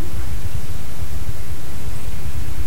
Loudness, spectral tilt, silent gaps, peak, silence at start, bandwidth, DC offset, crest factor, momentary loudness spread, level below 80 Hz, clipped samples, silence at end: -30 LUFS; -5 dB/octave; none; -6 dBFS; 0 s; 16.5 kHz; 30%; 14 dB; 3 LU; -32 dBFS; under 0.1%; 0 s